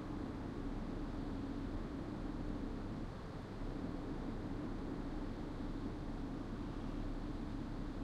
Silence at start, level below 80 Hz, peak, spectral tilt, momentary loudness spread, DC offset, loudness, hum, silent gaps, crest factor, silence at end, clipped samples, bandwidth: 0 s; -48 dBFS; -30 dBFS; -7.5 dB/octave; 1 LU; under 0.1%; -45 LUFS; none; none; 12 dB; 0 s; under 0.1%; 9.6 kHz